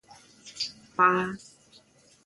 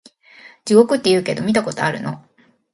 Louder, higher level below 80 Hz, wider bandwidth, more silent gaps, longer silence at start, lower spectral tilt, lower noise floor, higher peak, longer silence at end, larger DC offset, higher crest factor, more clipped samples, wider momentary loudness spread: second, -26 LUFS vs -17 LUFS; second, -70 dBFS vs -60 dBFS; about the same, 11.5 kHz vs 11.5 kHz; neither; second, 0.45 s vs 0.65 s; about the same, -4 dB/octave vs -5 dB/octave; first, -59 dBFS vs -46 dBFS; second, -6 dBFS vs 0 dBFS; first, 0.9 s vs 0.55 s; neither; first, 24 dB vs 18 dB; neither; first, 23 LU vs 16 LU